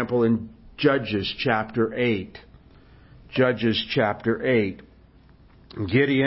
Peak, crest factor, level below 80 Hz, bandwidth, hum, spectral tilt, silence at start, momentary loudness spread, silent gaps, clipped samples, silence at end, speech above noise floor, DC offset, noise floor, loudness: -6 dBFS; 18 dB; -52 dBFS; 5.8 kHz; none; -10.5 dB/octave; 0 s; 11 LU; none; under 0.1%; 0 s; 30 dB; under 0.1%; -52 dBFS; -24 LUFS